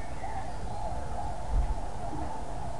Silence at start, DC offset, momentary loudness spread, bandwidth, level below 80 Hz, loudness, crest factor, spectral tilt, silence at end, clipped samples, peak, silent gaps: 0 s; 2%; 5 LU; 11.5 kHz; -36 dBFS; -37 LUFS; 18 dB; -6 dB/octave; 0 s; under 0.1%; -18 dBFS; none